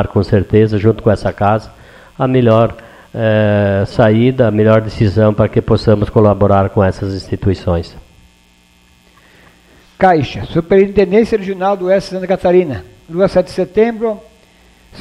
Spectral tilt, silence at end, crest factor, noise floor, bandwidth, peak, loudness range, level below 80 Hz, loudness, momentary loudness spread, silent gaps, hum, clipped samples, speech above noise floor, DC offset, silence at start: -8.5 dB/octave; 0 s; 14 dB; -49 dBFS; 10 kHz; 0 dBFS; 7 LU; -36 dBFS; -13 LUFS; 8 LU; none; none; under 0.1%; 37 dB; under 0.1%; 0 s